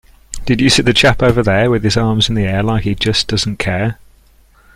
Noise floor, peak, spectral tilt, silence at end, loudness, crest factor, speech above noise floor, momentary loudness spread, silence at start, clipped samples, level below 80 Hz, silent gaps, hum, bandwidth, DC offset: -48 dBFS; 0 dBFS; -5 dB/octave; 0.85 s; -13 LUFS; 14 dB; 35 dB; 9 LU; 0.3 s; under 0.1%; -32 dBFS; none; none; 16 kHz; under 0.1%